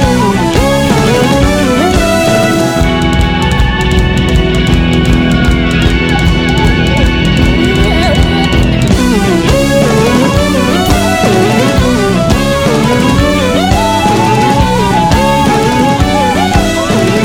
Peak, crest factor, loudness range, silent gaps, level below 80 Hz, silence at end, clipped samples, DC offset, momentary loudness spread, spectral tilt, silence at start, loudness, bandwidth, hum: 0 dBFS; 8 dB; 1 LU; none; -16 dBFS; 0 s; 0.2%; under 0.1%; 1 LU; -5.5 dB/octave; 0 s; -9 LUFS; 17.5 kHz; none